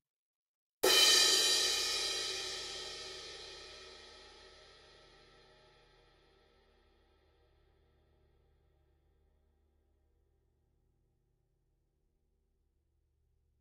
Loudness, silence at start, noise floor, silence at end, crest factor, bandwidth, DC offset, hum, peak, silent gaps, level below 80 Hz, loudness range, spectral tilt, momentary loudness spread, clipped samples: -28 LUFS; 0.85 s; -78 dBFS; 9.4 s; 26 dB; 16 kHz; under 0.1%; none; -14 dBFS; none; -70 dBFS; 23 LU; 1 dB/octave; 26 LU; under 0.1%